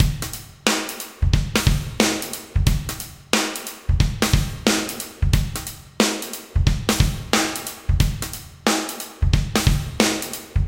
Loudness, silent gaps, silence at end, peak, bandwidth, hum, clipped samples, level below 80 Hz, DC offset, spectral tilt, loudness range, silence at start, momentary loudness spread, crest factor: -22 LUFS; none; 0 s; 0 dBFS; 17 kHz; none; under 0.1%; -26 dBFS; under 0.1%; -4 dB/octave; 1 LU; 0 s; 9 LU; 22 dB